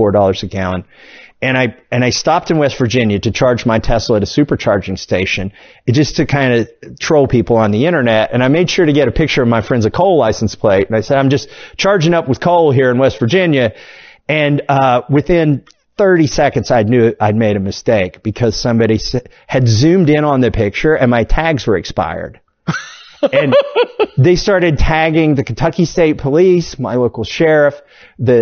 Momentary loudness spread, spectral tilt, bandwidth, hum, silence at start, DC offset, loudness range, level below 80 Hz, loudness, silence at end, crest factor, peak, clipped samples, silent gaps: 8 LU; -6 dB/octave; 6.8 kHz; none; 0 s; under 0.1%; 2 LU; -30 dBFS; -13 LUFS; 0 s; 12 dB; 0 dBFS; under 0.1%; none